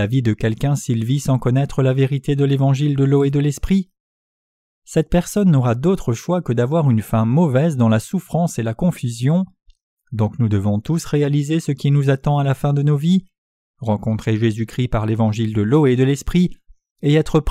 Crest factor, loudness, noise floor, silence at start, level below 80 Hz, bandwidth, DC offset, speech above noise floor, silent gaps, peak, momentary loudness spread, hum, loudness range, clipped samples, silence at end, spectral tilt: 14 dB; -18 LUFS; under -90 dBFS; 0 s; -38 dBFS; 14 kHz; under 0.1%; over 73 dB; 4.00-4.82 s, 9.83-9.97 s, 13.38-13.74 s, 16.91-16.96 s; -4 dBFS; 6 LU; none; 2 LU; under 0.1%; 0 s; -7.5 dB/octave